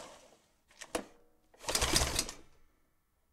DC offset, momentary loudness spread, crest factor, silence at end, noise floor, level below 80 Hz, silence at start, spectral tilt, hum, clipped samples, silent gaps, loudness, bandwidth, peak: under 0.1%; 24 LU; 26 dB; 0.9 s; -74 dBFS; -48 dBFS; 0 s; -2 dB/octave; none; under 0.1%; none; -33 LUFS; 16 kHz; -12 dBFS